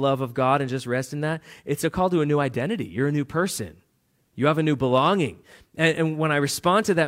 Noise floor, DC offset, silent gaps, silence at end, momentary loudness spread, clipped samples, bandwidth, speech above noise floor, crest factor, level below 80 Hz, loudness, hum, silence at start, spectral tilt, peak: -68 dBFS; under 0.1%; none; 0 s; 8 LU; under 0.1%; 16 kHz; 45 dB; 18 dB; -56 dBFS; -23 LUFS; none; 0 s; -5.5 dB/octave; -6 dBFS